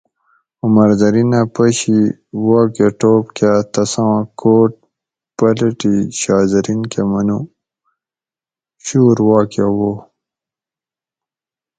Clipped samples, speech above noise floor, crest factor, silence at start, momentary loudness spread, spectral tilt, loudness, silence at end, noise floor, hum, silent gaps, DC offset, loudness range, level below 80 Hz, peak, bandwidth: under 0.1%; over 77 dB; 14 dB; 0.65 s; 8 LU; -6.5 dB/octave; -14 LUFS; 1.8 s; under -90 dBFS; none; none; under 0.1%; 4 LU; -50 dBFS; 0 dBFS; 9.4 kHz